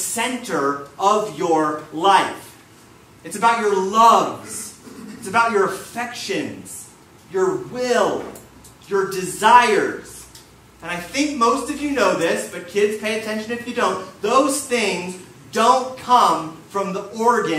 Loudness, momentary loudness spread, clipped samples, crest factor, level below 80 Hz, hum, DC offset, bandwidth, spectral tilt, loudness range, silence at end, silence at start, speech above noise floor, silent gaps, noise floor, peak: -19 LUFS; 16 LU; under 0.1%; 20 dB; -58 dBFS; none; under 0.1%; 16 kHz; -3 dB/octave; 5 LU; 0 s; 0 s; 28 dB; none; -47 dBFS; 0 dBFS